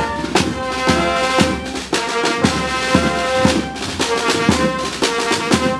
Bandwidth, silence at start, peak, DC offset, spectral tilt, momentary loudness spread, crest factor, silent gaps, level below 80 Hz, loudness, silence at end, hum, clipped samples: 15 kHz; 0 s; 0 dBFS; under 0.1%; -4 dB/octave; 5 LU; 18 dB; none; -36 dBFS; -17 LUFS; 0 s; none; under 0.1%